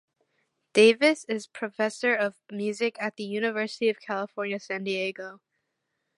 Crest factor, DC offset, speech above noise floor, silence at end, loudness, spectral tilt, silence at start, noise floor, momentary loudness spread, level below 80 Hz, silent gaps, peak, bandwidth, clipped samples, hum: 20 dB; under 0.1%; 53 dB; 0.85 s; -26 LUFS; -4 dB/octave; 0.75 s; -80 dBFS; 13 LU; -82 dBFS; none; -6 dBFS; 11.5 kHz; under 0.1%; none